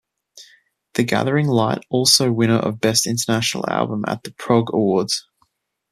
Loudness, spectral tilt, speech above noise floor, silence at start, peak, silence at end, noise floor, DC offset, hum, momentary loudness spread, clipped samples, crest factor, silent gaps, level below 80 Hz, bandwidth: -19 LUFS; -4 dB/octave; 47 dB; 0.35 s; 0 dBFS; 0.7 s; -66 dBFS; under 0.1%; none; 10 LU; under 0.1%; 20 dB; none; -58 dBFS; 14.5 kHz